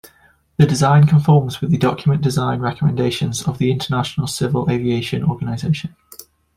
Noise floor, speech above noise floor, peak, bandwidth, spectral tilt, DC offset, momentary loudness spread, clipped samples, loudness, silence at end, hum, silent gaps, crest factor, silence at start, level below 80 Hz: -54 dBFS; 38 dB; -2 dBFS; 15.5 kHz; -6.5 dB/octave; under 0.1%; 9 LU; under 0.1%; -17 LUFS; 0.35 s; none; none; 16 dB; 0.6 s; -48 dBFS